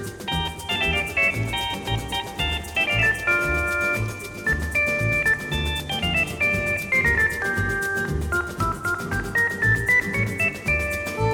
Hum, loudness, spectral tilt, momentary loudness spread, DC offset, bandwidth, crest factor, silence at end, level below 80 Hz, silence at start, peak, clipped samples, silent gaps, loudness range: none; -22 LUFS; -4 dB/octave; 7 LU; under 0.1%; over 20 kHz; 14 dB; 0 s; -36 dBFS; 0 s; -8 dBFS; under 0.1%; none; 1 LU